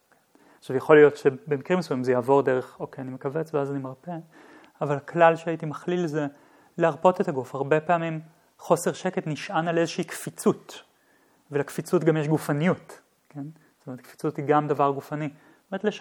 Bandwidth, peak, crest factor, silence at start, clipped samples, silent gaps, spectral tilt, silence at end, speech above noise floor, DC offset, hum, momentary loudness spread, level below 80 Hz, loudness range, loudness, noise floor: 18.5 kHz; -2 dBFS; 24 dB; 0.65 s; under 0.1%; none; -6.5 dB/octave; 0 s; 38 dB; under 0.1%; none; 18 LU; -78 dBFS; 5 LU; -25 LUFS; -62 dBFS